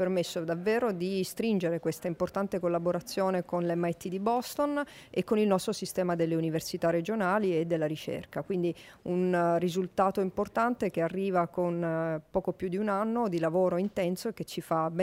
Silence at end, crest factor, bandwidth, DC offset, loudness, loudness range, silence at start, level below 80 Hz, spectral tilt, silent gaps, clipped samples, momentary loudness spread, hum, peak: 0 s; 18 dB; 16 kHz; under 0.1%; -30 LUFS; 1 LU; 0 s; -64 dBFS; -6 dB/octave; none; under 0.1%; 6 LU; none; -12 dBFS